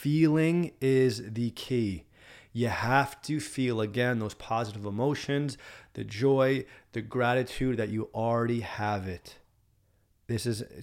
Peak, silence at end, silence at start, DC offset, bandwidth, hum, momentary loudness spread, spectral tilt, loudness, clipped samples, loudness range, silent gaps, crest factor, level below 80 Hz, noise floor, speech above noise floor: -10 dBFS; 0 s; 0 s; under 0.1%; 16.5 kHz; none; 13 LU; -6.5 dB/octave; -29 LUFS; under 0.1%; 3 LU; none; 20 dB; -58 dBFS; -68 dBFS; 39 dB